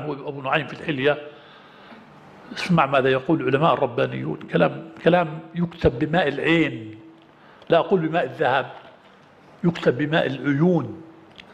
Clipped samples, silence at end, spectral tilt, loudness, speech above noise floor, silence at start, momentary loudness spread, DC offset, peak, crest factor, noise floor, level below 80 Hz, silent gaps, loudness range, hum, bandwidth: under 0.1%; 0.1 s; -7.5 dB/octave; -22 LUFS; 29 dB; 0 s; 11 LU; under 0.1%; -4 dBFS; 20 dB; -51 dBFS; -50 dBFS; none; 3 LU; none; 9.4 kHz